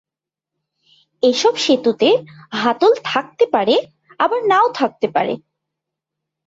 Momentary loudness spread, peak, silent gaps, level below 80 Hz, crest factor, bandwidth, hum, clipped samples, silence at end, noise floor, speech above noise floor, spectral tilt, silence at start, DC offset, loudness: 6 LU; -2 dBFS; none; -66 dBFS; 16 dB; 8 kHz; none; under 0.1%; 1.1 s; -86 dBFS; 70 dB; -3.5 dB/octave; 1.25 s; under 0.1%; -17 LUFS